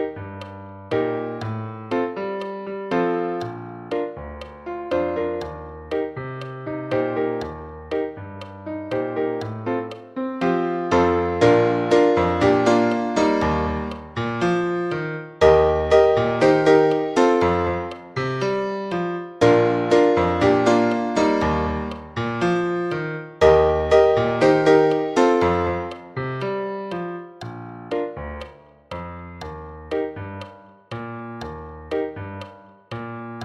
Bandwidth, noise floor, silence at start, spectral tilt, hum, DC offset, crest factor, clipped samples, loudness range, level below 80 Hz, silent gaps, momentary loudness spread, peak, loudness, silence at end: 10.5 kHz; -42 dBFS; 0 s; -6.5 dB/octave; none; under 0.1%; 20 dB; under 0.1%; 14 LU; -42 dBFS; none; 19 LU; -2 dBFS; -21 LUFS; 0 s